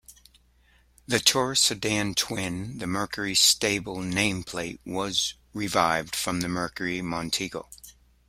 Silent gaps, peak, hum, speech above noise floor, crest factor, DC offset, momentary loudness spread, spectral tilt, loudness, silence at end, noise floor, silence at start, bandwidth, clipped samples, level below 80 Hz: none; -4 dBFS; none; 34 dB; 24 dB; under 0.1%; 13 LU; -2.5 dB/octave; -25 LUFS; 0.4 s; -61 dBFS; 0.1 s; 16.5 kHz; under 0.1%; -54 dBFS